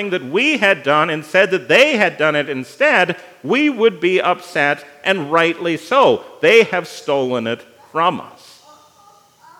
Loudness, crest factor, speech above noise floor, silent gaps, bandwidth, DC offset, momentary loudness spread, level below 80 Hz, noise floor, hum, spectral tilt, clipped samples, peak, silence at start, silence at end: -15 LUFS; 16 dB; 33 dB; none; 16 kHz; under 0.1%; 10 LU; -76 dBFS; -49 dBFS; none; -4.5 dB/octave; under 0.1%; 0 dBFS; 0 s; 1.3 s